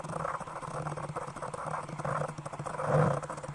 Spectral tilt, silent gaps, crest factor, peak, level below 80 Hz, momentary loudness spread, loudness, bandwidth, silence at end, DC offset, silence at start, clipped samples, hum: -6.5 dB/octave; none; 22 dB; -12 dBFS; -60 dBFS; 11 LU; -35 LUFS; 11.5 kHz; 0 s; under 0.1%; 0 s; under 0.1%; none